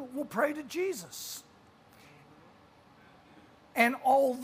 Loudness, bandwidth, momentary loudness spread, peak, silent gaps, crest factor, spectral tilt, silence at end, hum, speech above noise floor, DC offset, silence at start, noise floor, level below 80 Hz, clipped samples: -30 LUFS; 15.5 kHz; 14 LU; -12 dBFS; none; 22 dB; -3.5 dB/octave; 0 s; none; 29 dB; under 0.1%; 0 s; -59 dBFS; -76 dBFS; under 0.1%